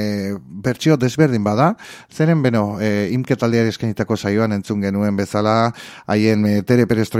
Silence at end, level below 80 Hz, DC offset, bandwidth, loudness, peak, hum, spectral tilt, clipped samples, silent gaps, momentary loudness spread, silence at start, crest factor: 0 s; -54 dBFS; under 0.1%; 15.5 kHz; -18 LUFS; 0 dBFS; none; -7 dB/octave; under 0.1%; none; 7 LU; 0 s; 16 dB